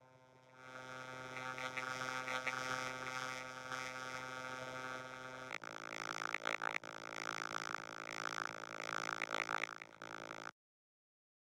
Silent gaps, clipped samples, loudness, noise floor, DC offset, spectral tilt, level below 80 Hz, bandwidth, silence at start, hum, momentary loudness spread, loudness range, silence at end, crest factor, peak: none; under 0.1%; -44 LUFS; -65 dBFS; under 0.1%; -2.5 dB/octave; -80 dBFS; 16.5 kHz; 0 s; none; 10 LU; 2 LU; 1 s; 26 dB; -20 dBFS